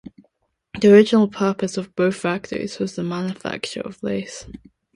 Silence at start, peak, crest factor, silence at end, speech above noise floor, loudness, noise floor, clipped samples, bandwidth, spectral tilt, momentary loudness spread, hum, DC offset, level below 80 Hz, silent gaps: 0.75 s; 0 dBFS; 20 dB; 0.4 s; 47 dB; -20 LUFS; -67 dBFS; under 0.1%; 11.5 kHz; -6 dB/octave; 16 LU; none; under 0.1%; -56 dBFS; none